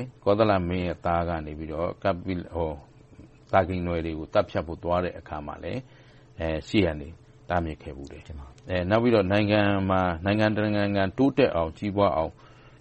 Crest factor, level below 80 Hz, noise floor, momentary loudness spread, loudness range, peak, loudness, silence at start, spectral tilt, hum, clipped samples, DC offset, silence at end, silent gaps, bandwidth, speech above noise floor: 20 dB; -46 dBFS; -50 dBFS; 15 LU; 7 LU; -6 dBFS; -26 LUFS; 0 s; -8 dB/octave; none; under 0.1%; under 0.1%; 0.1 s; none; 8.4 kHz; 25 dB